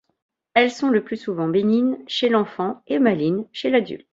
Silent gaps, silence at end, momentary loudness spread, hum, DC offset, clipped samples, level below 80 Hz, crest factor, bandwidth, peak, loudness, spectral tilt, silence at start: none; 0.15 s; 6 LU; none; under 0.1%; under 0.1%; -66 dBFS; 18 dB; 7.8 kHz; -2 dBFS; -21 LUFS; -6 dB/octave; 0.55 s